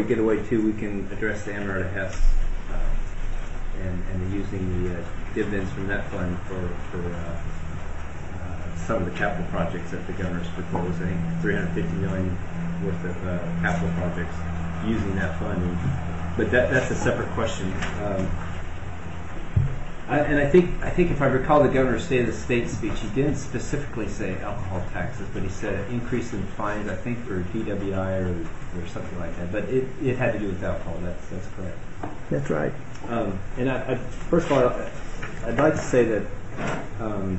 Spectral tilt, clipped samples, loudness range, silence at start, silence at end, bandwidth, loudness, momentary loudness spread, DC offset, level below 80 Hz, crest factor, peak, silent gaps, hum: -7 dB/octave; under 0.1%; 8 LU; 0 s; 0 s; 8.2 kHz; -27 LUFS; 13 LU; 2%; -32 dBFS; 20 dB; -6 dBFS; none; none